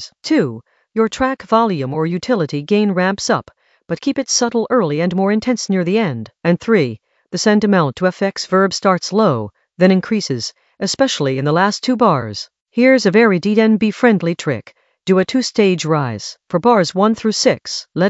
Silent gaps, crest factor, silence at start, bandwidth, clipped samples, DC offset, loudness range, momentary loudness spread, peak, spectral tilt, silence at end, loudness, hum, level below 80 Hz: 12.61-12.65 s; 16 dB; 0 s; 8.2 kHz; under 0.1%; under 0.1%; 3 LU; 10 LU; 0 dBFS; -5 dB/octave; 0 s; -16 LUFS; none; -54 dBFS